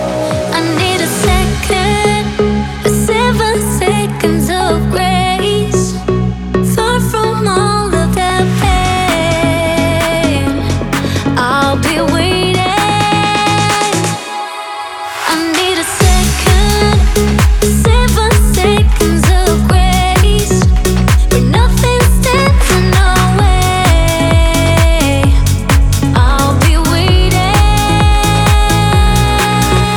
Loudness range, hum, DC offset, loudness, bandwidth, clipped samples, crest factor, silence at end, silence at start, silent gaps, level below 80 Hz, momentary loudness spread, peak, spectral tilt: 3 LU; none; under 0.1%; -11 LUFS; 20 kHz; under 0.1%; 10 dB; 0 s; 0 s; none; -16 dBFS; 4 LU; 0 dBFS; -5 dB/octave